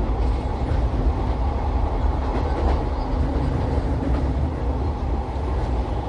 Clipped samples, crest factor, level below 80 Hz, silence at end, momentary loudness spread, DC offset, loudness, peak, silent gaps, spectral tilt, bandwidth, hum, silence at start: under 0.1%; 12 dB; -24 dBFS; 0 s; 2 LU; under 0.1%; -24 LUFS; -10 dBFS; none; -8.5 dB/octave; 7 kHz; none; 0 s